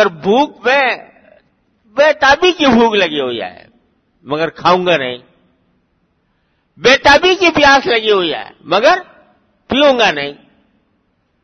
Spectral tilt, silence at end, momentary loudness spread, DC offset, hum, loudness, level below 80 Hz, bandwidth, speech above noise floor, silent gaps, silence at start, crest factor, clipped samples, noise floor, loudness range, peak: -3.5 dB/octave; 1.1 s; 14 LU; under 0.1%; none; -12 LUFS; -46 dBFS; 6.8 kHz; 50 dB; none; 0 s; 14 dB; under 0.1%; -61 dBFS; 6 LU; 0 dBFS